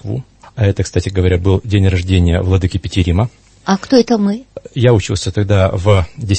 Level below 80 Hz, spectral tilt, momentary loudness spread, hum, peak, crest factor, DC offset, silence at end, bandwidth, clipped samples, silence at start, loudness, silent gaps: -30 dBFS; -6.5 dB/octave; 9 LU; none; 0 dBFS; 14 dB; under 0.1%; 0 s; 8.6 kHz; under 0.1%; 0.05 s; -14 LUFS; none